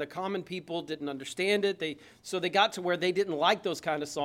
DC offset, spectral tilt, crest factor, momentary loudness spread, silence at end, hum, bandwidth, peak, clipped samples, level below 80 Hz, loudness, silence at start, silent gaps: under 0.1%; -4 dB/octave; 20 dB; 10 LU; 0 s; none; 16 kHz; -10 dBFS; under 0.1%; -74 dBFS; -30 LUFS; 0 s; none